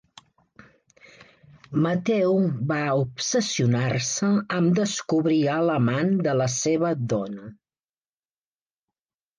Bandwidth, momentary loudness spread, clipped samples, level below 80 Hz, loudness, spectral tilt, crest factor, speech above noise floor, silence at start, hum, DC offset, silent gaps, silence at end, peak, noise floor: 10.5 kHz; 4 LU; under 0.1%; -64 dBFS; -23 LUFS; -5.5 dB/octave; 14 dB; over 67 dB; 1.2 s; none; under 0.1%; none; 1.85 s; -12 dBFS; under -90 dBFS